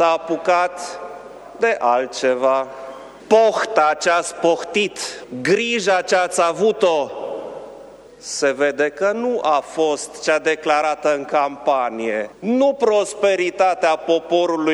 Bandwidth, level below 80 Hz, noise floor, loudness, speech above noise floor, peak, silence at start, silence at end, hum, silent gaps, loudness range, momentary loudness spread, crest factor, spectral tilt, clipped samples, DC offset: 12.5 kHz; -62 dBFS; -40 dBFS; -19 LUFS; 22 dB; 0 dBFS; 0 s; 0 s; none; none; 2 LU; 13 LU; 18 dB; -3 dB/octave; under 0.1%; under 0.1%